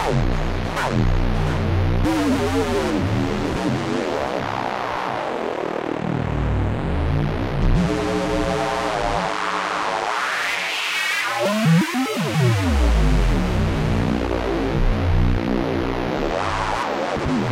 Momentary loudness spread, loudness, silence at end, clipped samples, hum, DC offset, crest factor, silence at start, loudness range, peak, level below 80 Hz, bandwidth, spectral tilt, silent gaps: 5 LU; -21 LUFS; 0 s; under 0.1%; none; under 0.1%; 14 dB; 0 s; 4 LU; -6 dBFS; -26 dBFS; 16 kHz; -6 dB/octave; none